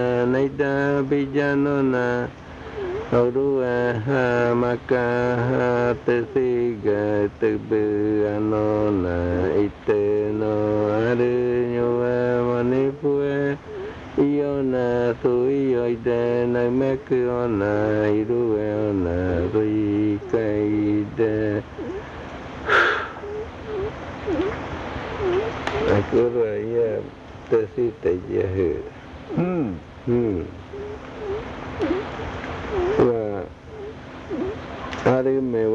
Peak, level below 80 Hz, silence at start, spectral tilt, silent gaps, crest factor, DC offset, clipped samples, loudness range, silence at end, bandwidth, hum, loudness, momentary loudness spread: -6 dBFS; -46 dBFS; 0 s; -8 dB/octave; none; 16 dB; under 0.1%; under 0.1%; 4 LU; 0 s; 7.4 kHz; none; -22 LUFS; 12 LU